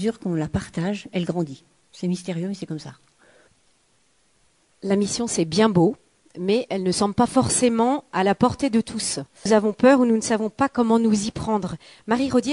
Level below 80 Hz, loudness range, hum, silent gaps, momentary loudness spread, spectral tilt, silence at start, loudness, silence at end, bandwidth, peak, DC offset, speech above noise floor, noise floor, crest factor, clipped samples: -54 dBFS; 10 LU; none; none; 12 LU; -5 dB/octave; 0 s; -22 LUFS; 0 s; 11.5 kHz; -6 dBFS; under 0.1%; 43 dB; -64 dBFS; 18 dB; under 0.1%